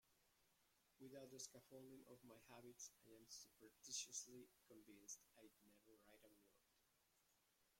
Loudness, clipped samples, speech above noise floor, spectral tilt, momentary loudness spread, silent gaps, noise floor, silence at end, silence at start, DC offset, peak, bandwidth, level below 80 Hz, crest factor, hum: -59 LUFS; under 0.1%; 22 dB; -1.5 dB/octave; 15 LU; none; -84 dBFS; 0 s; 0.05 s; under 0.1%; -38 dBFS; 16.5 kHz; under -90 dBFS; 26 dB; none